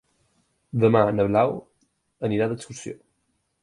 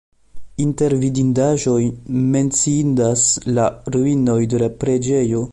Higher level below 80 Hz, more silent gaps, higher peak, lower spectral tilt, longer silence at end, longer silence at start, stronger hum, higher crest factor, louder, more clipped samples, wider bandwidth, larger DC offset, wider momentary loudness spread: second, -56 dBFS vs -46 dBFS; neither; about the same, -4 dBFS vs -4 dBFS; about the same, -7 dB/octave vs -6 dB/octave; first, 0.7 s vs 0 s; first, 0.75 s vs 0.35 s; neither; first, 22 dB vs 14 dB; second, -23 LUFS vs -17 LUFS; neither; about the same, 11 kHz vs 11.5 kHz; neither; first, 18 LU vs 5 LU